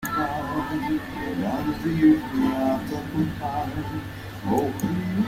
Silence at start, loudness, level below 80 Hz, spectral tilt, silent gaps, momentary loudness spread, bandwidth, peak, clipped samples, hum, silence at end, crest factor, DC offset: 0 s; -25 LUFS; -46 dBFS; -7 dB/octave; none; 11 LU; 16 kHz; -8 dBFS; under 0.1%; none; 0 s; 16 dB; under 0.1%